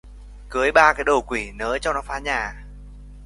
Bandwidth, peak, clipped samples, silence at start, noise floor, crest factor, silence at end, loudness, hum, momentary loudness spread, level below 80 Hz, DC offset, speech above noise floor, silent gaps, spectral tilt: 11.5 kHz; 0 dBFS; under 0.1%; 0.05 s; -40 dBFS; 22 dB; 0 s; -21 LUFS; 50 Hz at -40 dBFS; 14 LU; -38 dBFS; under 0.1%; 19 dB; none; -3.5 dB/octave